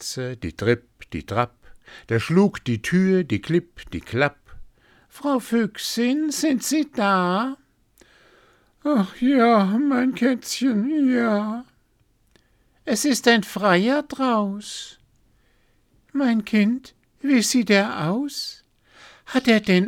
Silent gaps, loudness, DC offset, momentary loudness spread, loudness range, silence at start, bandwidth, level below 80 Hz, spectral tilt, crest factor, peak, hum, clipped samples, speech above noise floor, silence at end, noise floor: none; -21 LUFS; under 0.1%; 12 LU; 3 LU; 0 s; 17 kHz; -54 dBFS; -5 dB/octave; 20 dB; -2 dBFS; none; under 0.1%; 42 dB; 0 s; -63 dBFS